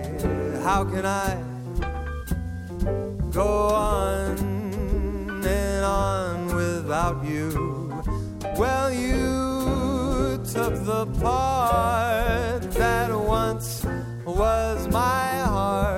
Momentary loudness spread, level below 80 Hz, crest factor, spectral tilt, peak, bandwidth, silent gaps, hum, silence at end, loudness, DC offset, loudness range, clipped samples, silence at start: 8 LU; -32 dBFS; 14 dB; -6 dB/octave; -10 dBFS; 16.5 kHz; none; none; 0 s; -25 LUFS; under 0.1%; 3 LU; under 0.1%; 0 s